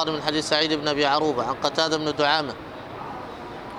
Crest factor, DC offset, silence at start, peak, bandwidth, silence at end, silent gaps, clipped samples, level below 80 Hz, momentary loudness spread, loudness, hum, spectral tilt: 18 dB; under 0.1%; 0 s; -6 dBFS; 14 kHz; 0 s; none; under 0.1%; -54 dBFS; 15 LU; -23 LUFS; none; -3.5 dB/octave